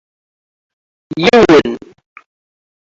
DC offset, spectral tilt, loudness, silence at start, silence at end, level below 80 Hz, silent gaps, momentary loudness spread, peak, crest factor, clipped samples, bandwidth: under 0.1%; -5.5 dB/octave; -9 LUFS; 1.1 s; 1.15 s; -46 dBFS; none; 19 LU; 0 dBFS; 16 dB; under 0.1%; 7.8 kHz